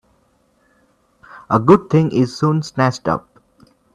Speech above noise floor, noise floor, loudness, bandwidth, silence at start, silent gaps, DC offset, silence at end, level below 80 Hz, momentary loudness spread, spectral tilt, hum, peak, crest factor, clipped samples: 44 dB; -59 dBFS; -16 LUFS; 10 kHz; 1.35 s; none; under 0.1%; 0.75 s; -52 dBFS; 9 LU; -7.5 dB/octave; none; 0 dBFS; 18 dB; under 0.1%